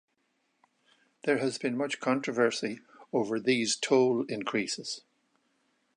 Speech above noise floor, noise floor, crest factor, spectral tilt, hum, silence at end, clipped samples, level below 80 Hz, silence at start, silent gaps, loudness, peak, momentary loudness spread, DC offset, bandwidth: 47 dB; -76 dBFS; 20 dB; -3.5 dB/octave; none; 1 s; under 0.1%; -80 dBFS; 1.25 s; none; -29 LUFS; -12 dBFS; 11 LU; under 0.1%; 11 kHz